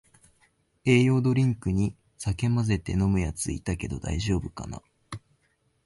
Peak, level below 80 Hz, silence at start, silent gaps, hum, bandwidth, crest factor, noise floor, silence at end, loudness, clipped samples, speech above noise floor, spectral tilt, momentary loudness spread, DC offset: -10 dBFS; -42 dBFS; 0.85 s; none; none; 11.5 kHz; 18 dB; -70 dBFS; 0.65 s; -26 LUFS; under 0.1%; 45 dB; -6.5 dB/octave; 19 LU; under 0.1%